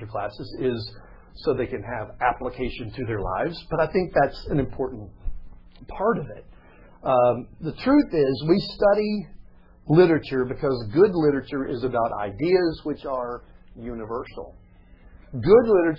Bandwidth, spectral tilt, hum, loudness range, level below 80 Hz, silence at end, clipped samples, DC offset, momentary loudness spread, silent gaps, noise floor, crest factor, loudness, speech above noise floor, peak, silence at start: 5.8 kHz; -9.5 dB/octave; none; 6 LU; -44 dBFS; 0 s; under 0.1%; under 0.1%; 19 LU; none; -50 dBFS; 20 dB; -23 LUFS; 27 dB; -4 dBFS; 0 s